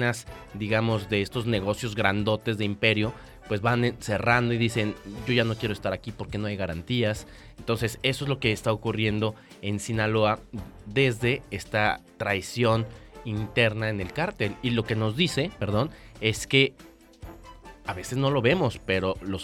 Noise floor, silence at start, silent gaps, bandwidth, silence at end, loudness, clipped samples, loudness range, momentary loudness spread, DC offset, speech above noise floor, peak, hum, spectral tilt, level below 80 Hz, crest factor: -47 dBFS; 0 s; none; 15 kHz; 0 s; -26 LUFS; under 0.1%; 3 LU; 12 LU; under 0.1%; 20 dB; -4 dBFS; none; -5.5 dB/octave; -50 dBFS; 22 dB